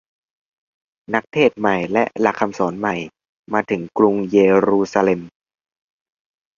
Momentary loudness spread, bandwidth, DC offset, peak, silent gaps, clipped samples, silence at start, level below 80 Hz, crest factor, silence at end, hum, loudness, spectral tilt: 9 LU; 7.4 kHz; under 0.1%; -2 dBFS; 3.29-3.44 s; under 0.1%; 1.1 s; -58 dBFS; 18 dB; 1.3 s; none; -18 LUFS; -6.5 dB/octave